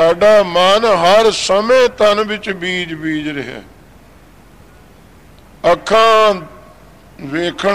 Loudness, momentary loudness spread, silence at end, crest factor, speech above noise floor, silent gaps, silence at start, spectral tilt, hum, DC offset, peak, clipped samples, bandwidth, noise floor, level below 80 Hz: -12 LUFS; 14 LU; 0 s; 10 dB; 30 dB; none; 0 s; -3.5 dB/octave; none; under 0.1%; -4 dBFS; under 0.1%; 15 kHz; -43 dBFS; -46 dBFS